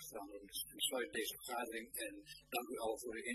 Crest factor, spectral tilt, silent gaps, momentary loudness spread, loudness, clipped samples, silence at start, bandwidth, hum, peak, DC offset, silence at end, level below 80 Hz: 20 dB; -1 dB/octave; none; 9 LU; -43 LUFS; under 0.1%; 0 s; 14 kHz; none; -26 dBFS; under 0.1%; 0 s; -74 dBFS